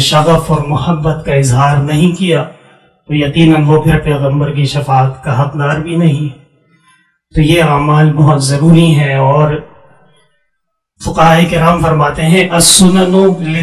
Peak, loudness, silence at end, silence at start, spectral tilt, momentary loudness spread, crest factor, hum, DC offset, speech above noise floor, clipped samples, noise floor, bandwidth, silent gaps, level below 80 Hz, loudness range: 0 dBFS; -10 LUFS; 0 s; 0 s; -5.5 dB/octave; 8 LU; 10 dB; none; under 0.1%; 60 dB; 0.3%; -69 dBFS; 15.5 kHz; none; -32 dBFS; 4 LU